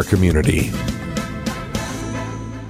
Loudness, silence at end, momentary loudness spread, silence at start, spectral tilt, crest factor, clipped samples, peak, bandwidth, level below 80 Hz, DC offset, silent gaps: -21 LUFS; 0 s; 10 LU; 0 s; -6 dB/octave; 18 dB; under 0.1%; -4 dBFS; 16 kHz; -30 dBFS; under 0.1%; none